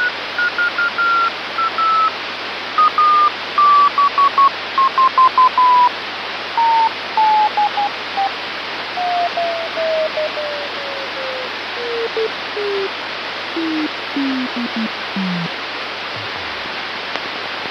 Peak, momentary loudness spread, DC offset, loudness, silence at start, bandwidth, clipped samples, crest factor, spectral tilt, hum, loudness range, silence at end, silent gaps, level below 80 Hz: 0 dBFS; 11 LU; under 0.1%; -17 LUFS; 0 s; 13 kHz; under 0.1%; 18 dB; -4 dB/octave; none; 8 LU; 0 s; none; -64 dBFS